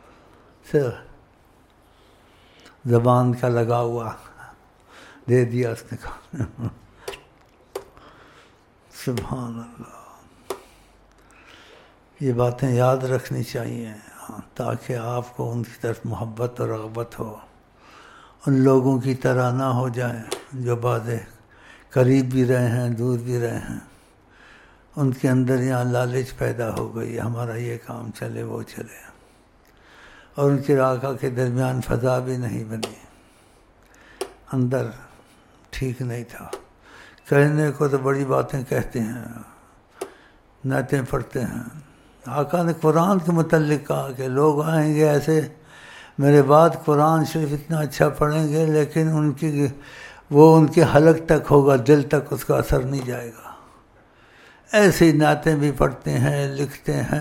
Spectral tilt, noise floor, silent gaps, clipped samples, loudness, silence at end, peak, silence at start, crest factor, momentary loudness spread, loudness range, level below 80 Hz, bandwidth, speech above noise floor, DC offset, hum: -7 dB/octave; -55 dBFS; none; under 0.1%; -21 LUFS; 0 s; 0 dBFS; 0.65 s; 22 dB; 20 LU; 12 LU; -46 dBFS; 16.5 kHz; 35 dB; under 0.1%; none